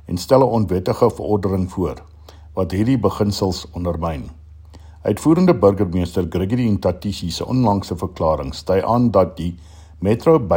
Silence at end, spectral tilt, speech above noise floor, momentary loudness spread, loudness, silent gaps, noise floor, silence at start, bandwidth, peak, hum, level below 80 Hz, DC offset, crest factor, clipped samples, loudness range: 0 s; -7.5 dB/octave; 23 dB; 11 LU; -19 LUFS; none; -40 dBFS; 0.05 s; 16.5 kHz; 0 dBFS; none; -40 dBFS; under 0.1%; 18 dB; under 0.1%; 4 LU